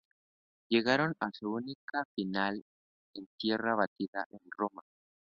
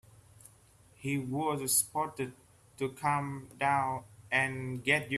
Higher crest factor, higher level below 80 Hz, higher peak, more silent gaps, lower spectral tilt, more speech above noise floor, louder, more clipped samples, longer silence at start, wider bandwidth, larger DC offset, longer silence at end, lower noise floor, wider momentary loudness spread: about the same, 24 dB vs 22 dB; second, -74 dBFS vs -66 dBFS; about the same, -12 dBFS vs -12 dBFS; first, 1.75-1.88 s, 2.05-2.15 s, 2.62-3.13 s, 3.26-3.38 s, 3.87-3.96 s, 4.08-4.13 s, 4.26-4.30 s vs none; about the same, -3 dB/octave vs -3.5 dB/octave; first, over 56 dB vs 29 dB; about the same, -34 LUFS vs -32 LUFS; neither; first, 0.7 s vs 0.45 s; second, 6.8 kHz vs 15.5 kHz; neither; first, 0.4 s vs 0 s; first, under -90 dBFS vs -61 dBFS; about the same, 14 LU vs 13 LU